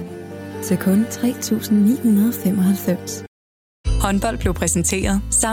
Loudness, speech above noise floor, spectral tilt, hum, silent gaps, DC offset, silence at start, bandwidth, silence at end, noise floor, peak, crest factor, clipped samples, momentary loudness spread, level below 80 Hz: -19 LUFS; over 72 dB; -5 dB/octave; none; 3.28-3.84 s; under 0.1%; 0 s; 18 kHz; 0 s; under -90 dBFS; -6 dBFS; 14 dB; under 0.1%; 14 LU; -30 dBFS